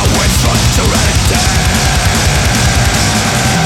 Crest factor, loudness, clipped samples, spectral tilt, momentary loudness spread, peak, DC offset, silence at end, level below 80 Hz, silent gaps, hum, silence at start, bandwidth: 10 dB; -10 LUFS; under 0.1%; -3.5 dB/octave; 1 LU; -2 dBFS; under 0.1%; 0 s; -16 dBFS; none; none; 0 s; 18.5 kHz